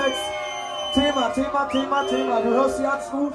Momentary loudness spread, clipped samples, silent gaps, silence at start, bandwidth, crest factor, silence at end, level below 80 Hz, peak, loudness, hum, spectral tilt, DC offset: 7 LU; under 0.1%; none; 0 s; 13.5 kHz; 14 dB; 0 s; -50 dBFS; -8 dBFS; -23 LUFS; none; -3.5 dB/octave; under 0.1%